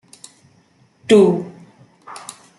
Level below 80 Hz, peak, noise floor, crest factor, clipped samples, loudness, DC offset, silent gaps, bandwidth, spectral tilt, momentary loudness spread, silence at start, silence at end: -64 dBFS; -2 dBFS; -56 dBFS; 18 dB; under 0.1%; -14 LUFS; under 0.1%; none; 12 kHz; -6 dB/octave; 24 LU; 1.1 s; 0.4 s